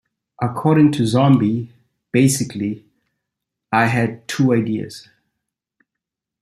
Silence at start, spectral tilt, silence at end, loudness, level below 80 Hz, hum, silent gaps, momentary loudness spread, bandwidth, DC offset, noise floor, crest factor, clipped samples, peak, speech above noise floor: 0.4 s; -6 dB/octave; 1.4 s; -18 LUFS; -58 dBFS; none; none; 12 LU; 14.5 kHz; under 0.1%; -83 dBFS; 18 dB; under 0.1%; -2 dBFS; 67 dB